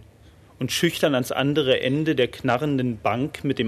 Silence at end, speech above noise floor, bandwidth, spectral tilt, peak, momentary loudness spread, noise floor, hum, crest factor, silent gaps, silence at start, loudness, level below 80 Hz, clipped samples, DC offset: 0 s; 28 dB; 14 kHz; -5 dB/octave; -6 dBFS; 5 LU; -51 dBFS; none; 16 dB; none; 0.6 s; -23 LUFS; -54 dBFS; under 0.1%; under 0.1%